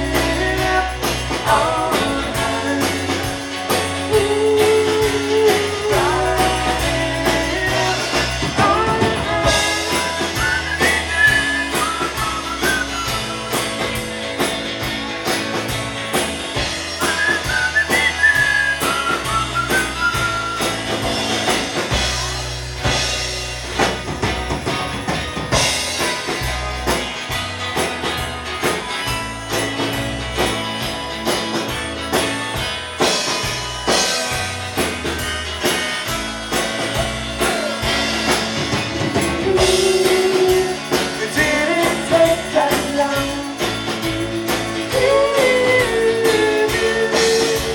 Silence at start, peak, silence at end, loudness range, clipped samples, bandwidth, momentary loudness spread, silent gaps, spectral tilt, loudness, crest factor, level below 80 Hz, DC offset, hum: 0 s; -2 dBFS; 0 s; 5 LU; under 0.1%; 19 kHz; 7 LU; none; -3 dB/octave; -18 LUFS; 18 dB; -34 dBFS; under 0.1%; none